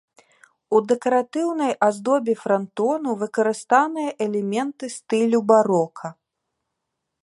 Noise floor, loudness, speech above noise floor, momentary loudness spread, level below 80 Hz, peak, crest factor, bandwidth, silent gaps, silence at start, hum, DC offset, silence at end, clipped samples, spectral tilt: -80 dBFS; -21 LUFS; 59 dB; 9 LU; -74 dBFS; -2 dBFS; 18 dB; 11.5 kHz; none; 0.7 s; none; under 0.1%; 1.1 s; under 0.1%; -5.5 dB/octave